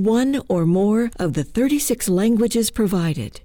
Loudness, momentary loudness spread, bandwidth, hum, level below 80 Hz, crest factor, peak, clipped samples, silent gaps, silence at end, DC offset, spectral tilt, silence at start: -19 LUFS; 5 LU; over 20 kHz; none; -42 dBFS; 8 dB; -10 dBFS; under 0.1%; none; 0.05 s; under 0.1%; -5.5 dB/octave; 0 s